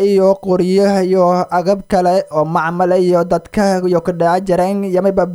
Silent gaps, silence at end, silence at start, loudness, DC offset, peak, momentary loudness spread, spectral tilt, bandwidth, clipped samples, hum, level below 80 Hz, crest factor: none; 0 s; 0 s; -14 LUFS; under 0.1%; 0 dBFS; 3 LU; -7 dB/octave; 13.5 kHz; under 0.1%; none; -44 dBFS; 14 dB